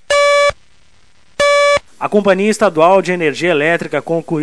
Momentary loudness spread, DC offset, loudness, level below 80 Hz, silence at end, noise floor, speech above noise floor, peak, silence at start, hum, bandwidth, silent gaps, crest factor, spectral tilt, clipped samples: 8 LU; under 0.1%; -13 LUFS; -48 dBFS; 0 s; -53 dBFS; 40 dB; 0 dBFS; 0.1 s; none; 11 kHz; none; 14 dB; -4 dB/octave; under 0.1%